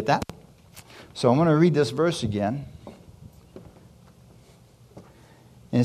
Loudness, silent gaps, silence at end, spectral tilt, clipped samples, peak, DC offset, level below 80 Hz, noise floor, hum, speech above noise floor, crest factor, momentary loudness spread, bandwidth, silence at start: -23 LUFS; none; 0 s; -7 dB/octave; under 0.1%; -6 dBFS; under 0.1%; -54 dBFS; -53 dBFS; none; 31 dB; 20 dB; 26 LU; 14 kHz; 0 s